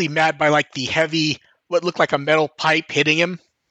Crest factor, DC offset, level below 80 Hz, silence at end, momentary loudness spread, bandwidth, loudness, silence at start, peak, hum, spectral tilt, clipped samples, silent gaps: 18 dB; under 0.1%; -64 dBFS; 0.35 s; 6 LU; 8.8 kHz; -19 LUFS; 0 s; -2 dBFS; none; -4 dB/octave; under 0.1%; none